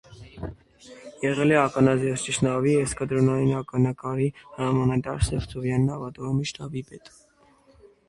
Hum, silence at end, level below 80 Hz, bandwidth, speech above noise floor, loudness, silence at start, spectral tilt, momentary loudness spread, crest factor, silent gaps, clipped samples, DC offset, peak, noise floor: none; 1 s; -44 dBFS; 11.5 kHz; 35 dB; -25 LUFS; 0.1 s; -6 dB/octave; 17 LU; 20 dB; none; under 0.1%; under 0.1%; -6 dBFS; -59 dBFS